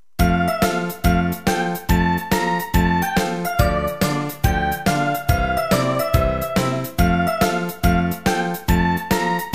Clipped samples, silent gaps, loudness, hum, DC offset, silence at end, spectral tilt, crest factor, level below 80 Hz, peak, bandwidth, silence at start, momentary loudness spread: under 0.1%; none; -20 LUFS; none; 0.6%; 0 s; -5.5 dB/octave; 16 dB; -28 dBFS; -2 dBFS; 15.5 kHz; 0.2 s; 3 LU